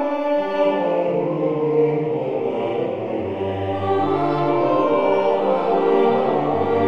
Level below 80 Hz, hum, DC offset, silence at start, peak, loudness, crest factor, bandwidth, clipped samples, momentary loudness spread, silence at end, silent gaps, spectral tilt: -64 dBFS; none; 0.7%; 0 s; -6 dBFS; -20 LUFS; 14 dB; 6.6 kHz; under 0.1%; 6 LU; 0 s; none; -8.5 dB/octave